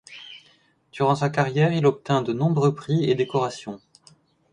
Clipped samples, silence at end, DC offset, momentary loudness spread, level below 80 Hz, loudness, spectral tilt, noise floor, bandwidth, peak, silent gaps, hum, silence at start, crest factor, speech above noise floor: under 0.1%; 0.75 s; under 0.1%; 20 LU; -62 dBFS; -22 LUFS; -7 dB/octave; -60 dBFS; 10 kHz; -6 dBFS; none; none; 0.1 s; 18 dB; 38 dB